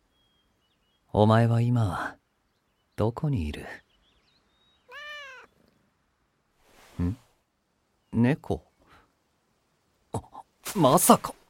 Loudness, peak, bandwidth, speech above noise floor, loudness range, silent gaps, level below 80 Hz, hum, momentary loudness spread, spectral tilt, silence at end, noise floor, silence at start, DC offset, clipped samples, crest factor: -25 LUFS; -4 dBFS; 16.5 kHz; 50 dB; 13 LU; none; -50 dBFS; none; 22 LU; -5.5 dB/octave; 0.2 s; -73 dBFS; 1.15 s; under 0.1%; under 0.1%; 26 dB